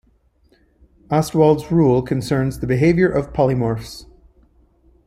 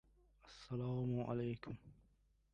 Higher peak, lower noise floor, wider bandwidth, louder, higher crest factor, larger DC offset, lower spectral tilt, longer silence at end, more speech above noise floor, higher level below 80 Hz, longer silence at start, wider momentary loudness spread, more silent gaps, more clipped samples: first, -2 dBFS vs -28 dBFS; second, -58 dBFS vs -75 dBFS; first, 15.5 kHz vs 8.4 kHz; first, -18 LUFS vs -44 LUFS; about the same, 18 dB vs 18 dB; neither; about the same, -7.5 dB/octave vs -8.5 dB/octave; first, 1.05 s vs 0.6 s; first, 41 dB vs 33 dB; first, -42 dBFS vs -68 dBFS; first, 1.1 s vs 0.45 s; second, 8 LU vs 16 LU; neither; neither